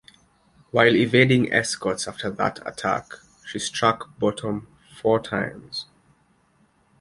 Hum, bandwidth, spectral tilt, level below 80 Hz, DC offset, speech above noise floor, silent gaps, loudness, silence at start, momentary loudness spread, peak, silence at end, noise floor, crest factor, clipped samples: none; 11.5 kHz; -4.5 dB/octave; -58 dBFS; under 0.1%; 40 dB; none; -23 LUFS; 0.75 s; 16 LU; -2 dBFS; 1.2 s; -62 dBFS; 22 dB; under 0.1%